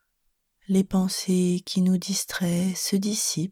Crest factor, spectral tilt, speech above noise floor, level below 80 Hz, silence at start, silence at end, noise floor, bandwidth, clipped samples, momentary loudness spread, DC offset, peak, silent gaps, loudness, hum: 14 dB; -4.5 dB/octave; 49 dB; -56 dBFS; 0.7 s; 0 s; -73 dBFS; 16.5 kHz; under 0.1%; 3 LU; under 0.1%; -10 dBFS; none; -24 LUFS; none